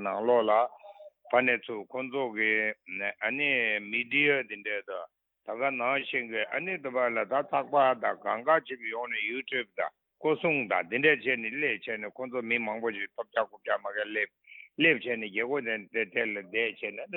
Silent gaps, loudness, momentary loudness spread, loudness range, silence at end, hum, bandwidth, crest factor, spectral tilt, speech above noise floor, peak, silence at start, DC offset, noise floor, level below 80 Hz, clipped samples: none; -29 LUFS; 11 LU; 2 LU; 0 s; none; 4.2 kHz; 22 dB; -8 dB/octave; 21 dB; -8 dBFS; 0 s; under 0.1%; -51 dBFS; -84 dBFS; under 0.1%